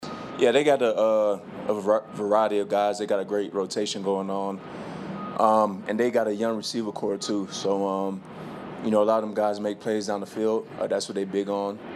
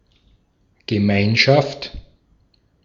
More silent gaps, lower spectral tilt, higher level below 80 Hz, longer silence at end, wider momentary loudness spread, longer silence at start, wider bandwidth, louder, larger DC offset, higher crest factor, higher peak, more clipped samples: neither; about the same, -5 dB/octave vs -6 dB/octave; second, -70 dBFS vs -46 dBFS; second, 0 s vs 0.85 s; second, 11 LU vs 19 LU; second, 0 s vs 0.9 s; first, 13 kHz vs 7.4 kHz; second, -26 LUFS vs -17 LUFS; neither; about the same, 20 dB vs 20 dB; second, -6 dBFS vs -2 dBFS; neither